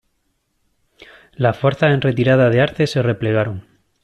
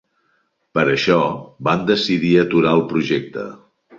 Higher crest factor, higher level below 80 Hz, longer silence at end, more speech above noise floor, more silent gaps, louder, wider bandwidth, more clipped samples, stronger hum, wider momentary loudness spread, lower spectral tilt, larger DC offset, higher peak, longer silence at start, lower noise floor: about the same, 16 dB vs 16 dB; about the same, -52 dBFS vs -56 dBFS; about the same, 0.4 s vs 0.45 s; first, 52 dB vs 48 dB; neither; about the same, -17 LUFS vs -17 LUFS; first, 10.5 kHz vs 7.6 kHz; neither; neither; second, 7 LU vs 10 LU; about the same, -7.5 dB/octave vs -6.5 dB/octave; neither; about the same, -2 dBFS vs -2 dBFS; first, 1.4 s vs 0.75 s; about the same, -68 dBFS vs -65 dBFS